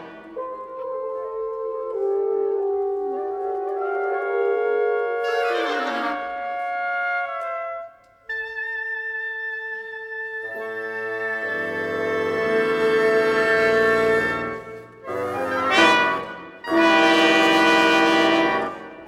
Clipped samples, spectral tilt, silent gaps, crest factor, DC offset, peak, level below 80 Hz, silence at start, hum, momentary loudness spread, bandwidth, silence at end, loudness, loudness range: under 0.1%; -3.5 dB/octave; none; 20 dB; under 0.1%; -4 dBFS; -60 dBFS; 0 s; none; 15 LU; 15.5 kHz; 0 s; -21 LUFS; 10 LU